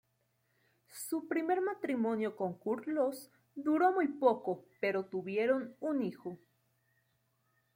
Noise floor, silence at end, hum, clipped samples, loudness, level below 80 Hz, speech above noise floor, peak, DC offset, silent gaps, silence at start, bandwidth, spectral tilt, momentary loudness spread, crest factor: -78 dBFS; 1.4 s; none; under 0.1%; -34 LUFS; -84 dBFS; 44 dB; -16 dBFS; under 0.1%; none; 0.9 s; 16.5 kHz; -6 dB/octave; 16 LU; 20 dB